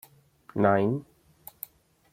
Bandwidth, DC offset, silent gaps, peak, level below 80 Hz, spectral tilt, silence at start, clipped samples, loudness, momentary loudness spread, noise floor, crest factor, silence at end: 16.5 kHz; under 0.1%; none; -8 dBFS; -66 dBFS; -8 dB/octave; 0.55 s; under 0.1%; -26 LUFS; 24 LU; -57 dBFS; 22 dB; 1.1 s